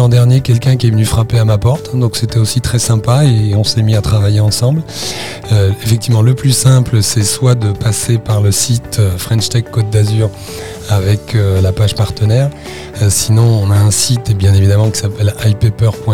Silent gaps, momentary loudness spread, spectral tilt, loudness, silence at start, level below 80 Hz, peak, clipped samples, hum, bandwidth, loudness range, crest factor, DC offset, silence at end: none; 5 LU; -5.5 dB/octave; -12 LUFS; 0 s; -32 dBFS; 0 dBFS; 0.1%; none; 16.5 kHz; 2 LU; 10 dB; 1%; 0 s